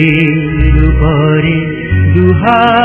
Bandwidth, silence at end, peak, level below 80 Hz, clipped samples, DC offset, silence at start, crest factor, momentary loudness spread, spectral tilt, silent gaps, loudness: 4 kHz; 0 s; 0 dBFS; -16 dBFS; 0.8%; under 0.1%; 0 s; 8 dB; 4 LU; -11 dB/octave; none; -10 LUFS